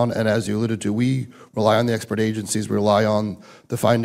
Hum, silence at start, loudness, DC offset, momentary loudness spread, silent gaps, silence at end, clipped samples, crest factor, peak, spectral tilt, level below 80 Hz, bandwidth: none; 0 s; -21 LUFS; under 0.1%; 10 LU; none; 0 s; under 0.1%; 16 dB; -4 dBFS; -6 dB/octave; -58 dBFS; 16 kHz